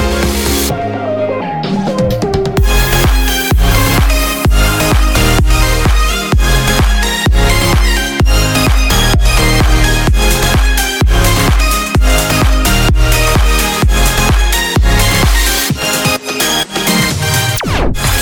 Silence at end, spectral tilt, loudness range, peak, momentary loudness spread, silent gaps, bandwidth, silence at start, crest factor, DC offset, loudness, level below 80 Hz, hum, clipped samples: 0 s; -4 dB/octave; 1 LU; 0 dBFS; 3 LU; none; 19.5 kHz; 0 s; 10 dB; under 0.1%; -11 LUFS; -12 dBFS; none; under 0.1%